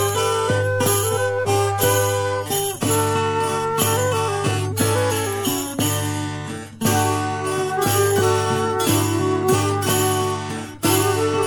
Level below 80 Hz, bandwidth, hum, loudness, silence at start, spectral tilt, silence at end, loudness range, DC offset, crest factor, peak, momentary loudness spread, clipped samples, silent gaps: -50 dBFS; 17.5 kHz; none; -20 LUFS; 0 s; -4 dB/octave; 0 s; 2 LU; under 0.1%; 16 dB; -4 dBFS; 5 LU; under 0.1%; none